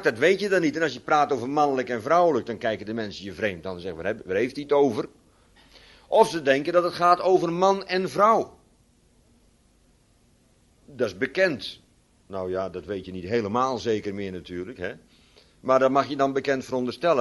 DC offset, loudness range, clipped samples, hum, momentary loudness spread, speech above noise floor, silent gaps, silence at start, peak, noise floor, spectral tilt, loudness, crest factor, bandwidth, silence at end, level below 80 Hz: under 0.1%; 8 LU; under 0.1%; none; 14 LU; 37 dB; none; 0 s; -4 dBFS; -61 dBFS; -5.5 dB/octave; -24 LUFS; 22 dB; 11.5 kHz; 0 s; -60 dBFS